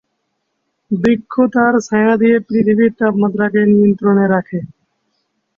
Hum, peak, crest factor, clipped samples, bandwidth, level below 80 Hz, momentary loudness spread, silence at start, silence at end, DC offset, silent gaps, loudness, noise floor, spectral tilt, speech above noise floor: none; -2 dBFS; 12 dB; under 0.1%; 7.4 kHz; -54 dBFS; 6 LU; 0.9 s; 0.9 s; under 0.1%; none; -13 LUFS; -70 dBFS; -8 dB/octave; 57 dB